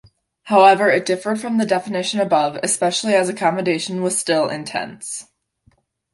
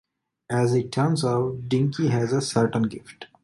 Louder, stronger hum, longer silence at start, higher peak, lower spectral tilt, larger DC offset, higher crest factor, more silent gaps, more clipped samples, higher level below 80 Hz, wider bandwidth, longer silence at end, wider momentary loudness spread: first, -18 LUFS vs -24 LUFS; neither; about the same, 0.45 s vs 0.5 s; first, -2 dBFS vs -8 dBFS; second, -3.5 dB/octave vs -6.5 dB/octave; neither; about the same, 18 dB vs 16 dB; neither; neither; second, -66 dBFS vs -58 dBFS; about the same, 11.5 kHz vs 11.5 kHz; first, 0.9 s vs 0.2 s; first, 14 LU vs 6 LU